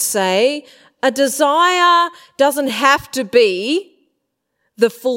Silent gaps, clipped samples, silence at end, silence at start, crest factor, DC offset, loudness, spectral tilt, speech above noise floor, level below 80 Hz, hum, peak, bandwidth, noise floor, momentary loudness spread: none; under 0.1%; 0 s; 0 s; 16 dB; under 0.1%; -15 LUFS; -2.5 dB/octave; 57 dB; -60 dBFS; none; 0 dBFS; 16.5 kHz; -72 dBFS; 8 LU